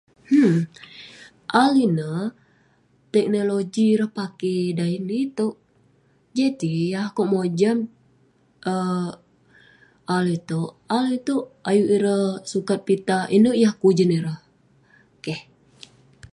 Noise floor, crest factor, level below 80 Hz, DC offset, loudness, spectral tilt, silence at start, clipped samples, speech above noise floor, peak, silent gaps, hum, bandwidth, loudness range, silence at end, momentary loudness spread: -60 dBFS; 20 dB; -66 dBFS; under 0.1%; -22 LUFS; -6.5 dB/octave; 0.3 s; under 0.1%; 40 dB; -2 dBFS; none; none; 11.5 kHz; 6 LU; 0.9 s; 14 LU